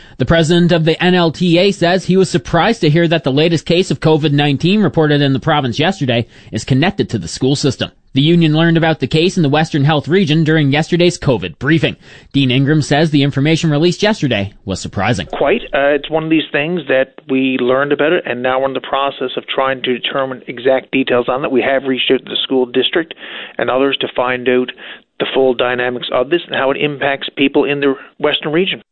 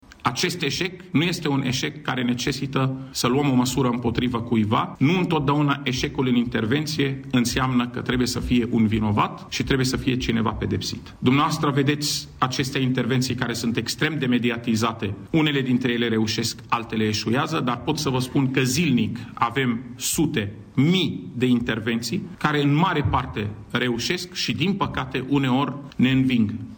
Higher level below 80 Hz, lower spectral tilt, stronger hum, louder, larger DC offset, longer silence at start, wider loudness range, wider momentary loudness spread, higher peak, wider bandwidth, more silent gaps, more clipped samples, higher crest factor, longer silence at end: about the same, -42 dBFS vs -46 dBFS; about the same, -6 dB/octave vs -5 dB/octave; neither; first, -14 LUFS vs -23 LUFS; neither; about the same, 0.2 s vs 0.1 s; about the same, 3 LU vs 1 LU; about the same, 6 LU vs 5 LU; first, -2 dBFS vs -8 dBFS; second, 9.2 kHz vs over 20 kHz; neither; neither; about the same, 12 dB vs 16 dB; about the same, 0.1 s vs 0 s